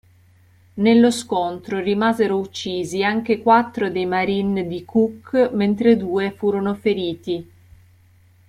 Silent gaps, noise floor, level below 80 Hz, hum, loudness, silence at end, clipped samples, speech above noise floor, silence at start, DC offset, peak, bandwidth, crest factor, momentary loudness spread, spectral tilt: none; -53 dBFS; -58 dBFS; none; -20 LUFS; 1.05 s; under 0.1%; 34 dB; 0.75 s; under 0.1%; -2 dBFS; 13 kHz; 18 dB; 9 LU; -6 dB/octave